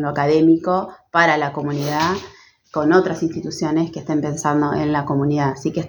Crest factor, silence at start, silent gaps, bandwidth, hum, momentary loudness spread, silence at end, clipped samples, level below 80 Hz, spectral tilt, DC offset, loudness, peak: 18 dB; 0 s; none; over 20 kHz; none; 8 LU; 0 s; under 0.1%; -52 dBFS; -6 dB/octave; under 0.1%; -19 LUFS; 0 dBFS